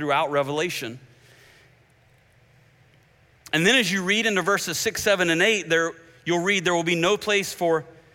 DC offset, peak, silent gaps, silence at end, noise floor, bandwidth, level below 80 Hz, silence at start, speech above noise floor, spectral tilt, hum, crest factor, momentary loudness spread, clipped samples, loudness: under 0.1%; -6 dBFS; none; 0.25 s; -58 dBFS; 17 kHz; -62 dBFS; 0 s; 36 dB; -3 dB/octave; none; 18 dB; 8 LU; under 0.1%; -22 LUFS